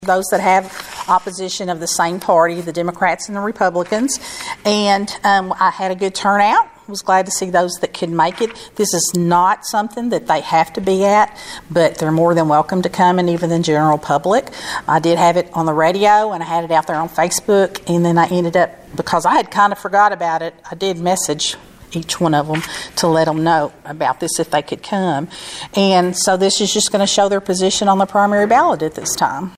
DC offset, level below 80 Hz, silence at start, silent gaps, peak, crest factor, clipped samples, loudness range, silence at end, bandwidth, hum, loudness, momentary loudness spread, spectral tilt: under 0.1%; -52 dBFS; 0 s; none; -2 dBFS; 14 dB; under 0.1%; 3 LU; 0.05 s; 16 kHz; none; -16 LUFS; 9 LU; -4 dB/octave